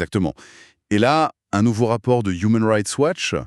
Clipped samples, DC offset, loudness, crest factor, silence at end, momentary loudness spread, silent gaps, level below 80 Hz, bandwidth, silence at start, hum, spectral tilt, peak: under 0.1%; under 0.1%; -19 LUFS; 16 dB; 0 s; 6 LU; none; -50 dBFS; 12.5 kHz; 0 s; none; -5.5 dB/octave; -2 dBFS